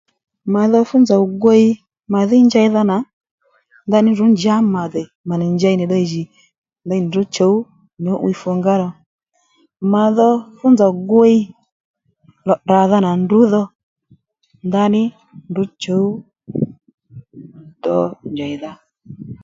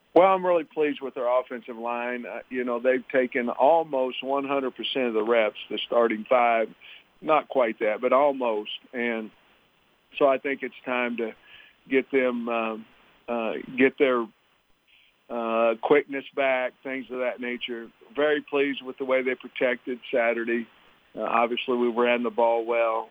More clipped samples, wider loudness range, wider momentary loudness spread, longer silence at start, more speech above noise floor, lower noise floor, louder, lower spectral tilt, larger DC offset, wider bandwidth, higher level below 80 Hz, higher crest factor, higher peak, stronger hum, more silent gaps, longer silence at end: neither; first, 7 LU vs 4 LU; about the same, 14 LU vs 12 LU; first, 0.45 s vs 0.15 s; first, 45 dB vs 40 dB; second, -59 dBFS vs -65 dBFS; first, -15 LUFS vs -25 LUFS; about the same, -7.5 dB/octave vs -6.5 dB/octave; neither; first, 7.6 kHz vs 4.9 kHz; first, -60 dBFS vs -76 dBFS; second, 16 dB vs 22 dB; first, 0 dBFS vs -4 dBFS; neither; first, 3.13-3.21 s, 3.31-3.38 s, 5.15-5.24 s, 6.58-6.62 s, 9.06-9.18 s, 11.72-11.94 s, 13.75-13.96 s, 16.94-16.98 s vs none; about the same, 0.1 s vs 0.05 s